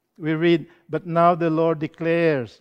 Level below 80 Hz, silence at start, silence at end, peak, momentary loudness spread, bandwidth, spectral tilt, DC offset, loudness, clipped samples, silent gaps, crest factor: -66 dBFS; 0.2 s; 0.15 s; -4 dBFS; 8 LU; 6.2 kHz; -8.5 dB/octave; under 0.1%; -21 LUFS; under 0.1%; none; 18 dB